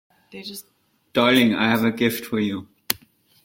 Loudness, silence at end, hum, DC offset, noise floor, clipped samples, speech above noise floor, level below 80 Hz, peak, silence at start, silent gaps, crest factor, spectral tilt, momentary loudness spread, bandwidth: -21 LUFS; 0.5 s; none; under 0.1%; -53 dBFS; under 0.1%; 33 dB; -60 dBFS; 0 dBFS; 0.35 s; none; 22 dB; -4.5 dB/octave; 19 LU; 16.5 kHz